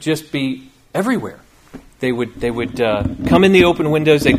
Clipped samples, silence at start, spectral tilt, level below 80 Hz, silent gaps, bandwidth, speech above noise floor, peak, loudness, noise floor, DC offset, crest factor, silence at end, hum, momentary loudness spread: under 0.1%; 0 s; -6 dB/octave; -38 dBFS; none; 15.5 kHz; 25 dB; 0 dBFS; -16 LUFS; -40 dBFS; under 0.1%; 16 dB; 0 s; none; 13 LU